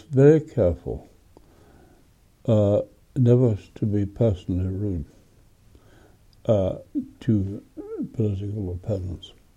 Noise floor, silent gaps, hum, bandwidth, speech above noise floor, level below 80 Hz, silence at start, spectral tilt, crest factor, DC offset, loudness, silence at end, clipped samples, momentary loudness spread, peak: -57 dBFS; none; none; 8 kHz; 35 dB; -46 dBFS; 0.1 s; -9.5 dB/octave; 20 dB; under 0.1%; -24 LUFS; 0.3 s; under 0.1%; 15 LU; -4 dBFS